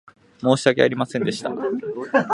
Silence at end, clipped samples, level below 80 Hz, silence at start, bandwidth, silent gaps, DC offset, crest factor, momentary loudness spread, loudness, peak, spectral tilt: 0 s; under 0.1%; -64 dBFS; 0.4 s; 11.5 kHz; none; under 0.1%; 20 dB; 8 LU; -21 LUFS; 0 dBFS; -5.5 dB/octave